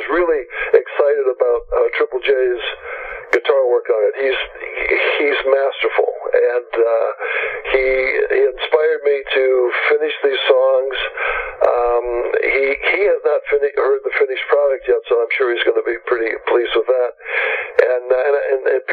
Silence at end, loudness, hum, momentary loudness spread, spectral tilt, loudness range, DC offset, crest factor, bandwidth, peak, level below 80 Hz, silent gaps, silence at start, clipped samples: 0 s; -17 LUFS; none; 5 LU; -4.5 dB/octave; 1 LU; under 0.1%; 16 dB; 5.4 kHz; 0 dBFS; -46 dBFS; none; 0 s; under 0.1%